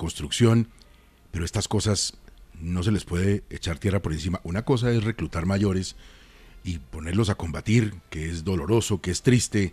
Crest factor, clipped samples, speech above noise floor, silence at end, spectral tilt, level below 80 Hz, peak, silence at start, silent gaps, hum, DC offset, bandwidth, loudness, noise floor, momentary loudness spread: 20 dB; under 0.1%; 30 dB; 0 s; -5.5 dB/octave; -44 dBFS; -6 dBFS; 0 s; none; none; under 0.1%; 14 kHz; -25 LUFS; -54 dBFS; 12 LU